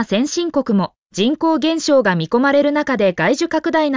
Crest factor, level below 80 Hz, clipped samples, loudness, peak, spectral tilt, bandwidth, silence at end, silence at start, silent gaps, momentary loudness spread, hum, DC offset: 12 dB; -56 dBFS; under 0.1%; -17 LUFS; -4 dBFS; -5 dB/octave; 7.6 kHz; 0 s; 0 s; 0.98-1.10 s; 5 LU; none; under 0.1%